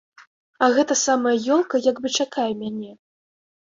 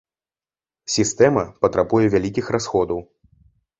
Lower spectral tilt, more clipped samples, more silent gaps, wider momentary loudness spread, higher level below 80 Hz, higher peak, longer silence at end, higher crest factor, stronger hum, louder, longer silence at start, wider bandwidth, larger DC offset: second, -2.5 dB/octave vs -5 dB/octave; neither; first, 0.27-0.53 s vs none; first, 11 LU vs 8 LU; second, -68 dBFS vs -48 dBFS; about the same, -4 dBFS vs -2 dBFS; about the same, 0.85 s vs 0.75 s; about the same, 20 dB vs 20 dB; neither; about the same, -21 LUFS vs -20 LUFS; second, 0.2 s vs 0.9 s; about the same, 7.8 kHz vs 8.4 kHz; neither